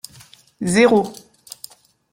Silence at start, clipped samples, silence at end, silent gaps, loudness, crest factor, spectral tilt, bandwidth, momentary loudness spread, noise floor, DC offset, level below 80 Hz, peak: 0.6 s; under 0.1%; 1 s; none; -17 LUFS; 18 dB; -5 dB/octave; 17 kHz; 25 LU; -48 dBFS; under 0.1%; -56 dBFS; -2 dBFS